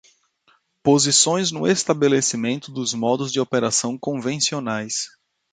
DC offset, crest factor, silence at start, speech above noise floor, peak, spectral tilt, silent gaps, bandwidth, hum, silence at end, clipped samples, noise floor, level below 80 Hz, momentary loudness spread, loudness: under 0.1%; 18 dB; 0.85 s; 41 dB; -4 dBFS; -3 dB/octave; none; 9.6 kHz; none; 0.45 s; under 0.1%; -62 dBFS; -64 dBFS; 10 LU; -20 LUFS